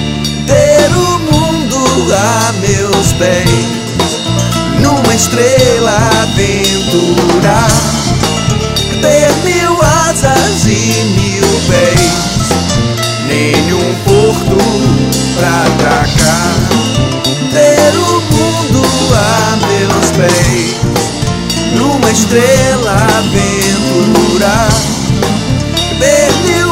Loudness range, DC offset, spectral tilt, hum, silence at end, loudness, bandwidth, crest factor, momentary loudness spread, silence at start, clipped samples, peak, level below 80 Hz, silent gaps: 1 LU; under 0.1%; -4.5 dB/octave; none; 0 s; -9 LUFS; 16.5 kHz; 10 dB; 4 LU; 0 s; 0.1%; 0 dBFS; -26 dBFS; none